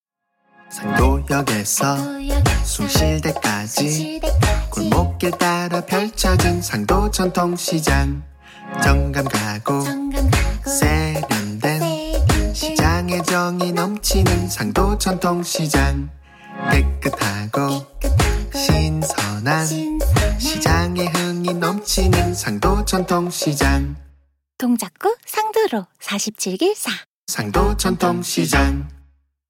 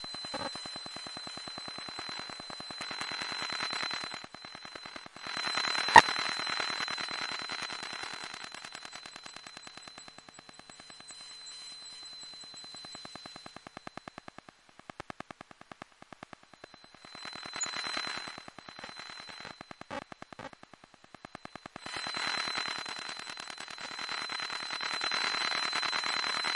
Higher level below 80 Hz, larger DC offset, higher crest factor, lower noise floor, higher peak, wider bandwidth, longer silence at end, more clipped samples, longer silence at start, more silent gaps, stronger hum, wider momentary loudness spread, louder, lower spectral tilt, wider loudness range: first, -26 dBFS vs -70 dBFS; neither; second, 18 dB vs 36 dB; first, -67 dBFS vs -58 dBFS; about the same, -2 dBFS vs 0 dBFS; first, 17 kHz vs 11.5 kHz; first, 0.5 s vs 0 s; neither; first, 0.7 s vs 0 s; first, 27.06-27.27 s vs none; neither; second, 6 LU vs 20 LU; first, -19 LUFS vs -33 LUFS; first, -4.5 dB/octave vs -1 dB/octave; second, 2 LU vs 19 LU